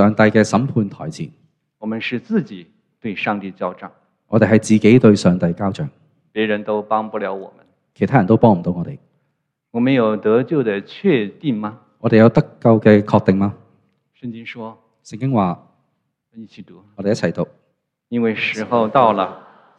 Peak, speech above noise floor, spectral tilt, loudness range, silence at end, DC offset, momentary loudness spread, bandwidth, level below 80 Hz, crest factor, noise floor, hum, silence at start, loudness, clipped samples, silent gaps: 0 dBFS; 54 dB; -7 dB/octave; 9 LU; 0.4 s; under 0.1%; 18 LU; 10 kHz; -56 dBFS; 18 dB; -71 dBFS; none; 0 s; -17 LUFS; under 0.1%; none